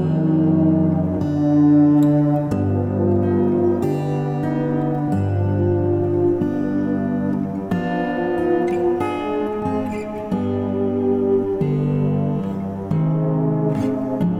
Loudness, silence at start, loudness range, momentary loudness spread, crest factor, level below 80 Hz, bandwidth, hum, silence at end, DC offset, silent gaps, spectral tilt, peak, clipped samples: -19 LUFS; 0 s; 4 LU; 7 LU; 12 dB; -50 dBFS; 8 kHz; none; 0 s; under 0.1%; none; -10 dB/octave; -6 dBFS; under 0.1%